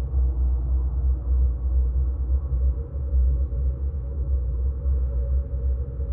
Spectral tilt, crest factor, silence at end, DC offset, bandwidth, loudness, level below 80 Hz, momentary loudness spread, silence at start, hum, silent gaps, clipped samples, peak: -14 dB/octave; 10 dB; 0 s; under 0.1%; 1.4 kHz; -26 LUFS; -22 dBFS; 4 LU; 0 s; none; none; under 0.1%; -14 dBFS